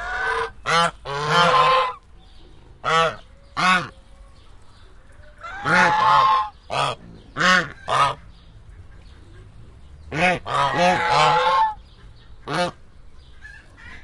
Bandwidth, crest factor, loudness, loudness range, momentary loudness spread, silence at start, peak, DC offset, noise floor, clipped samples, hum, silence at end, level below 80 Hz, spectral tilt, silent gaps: 11.5 kHz; 20 dB; -19 LUFS; 5 LU; 20 LU; 0 s; -2 dBFS; under 0.1%; -45 dBFS; under 0.1%; none; 0 s; -46 dBFS; -3.5 dB/octave; none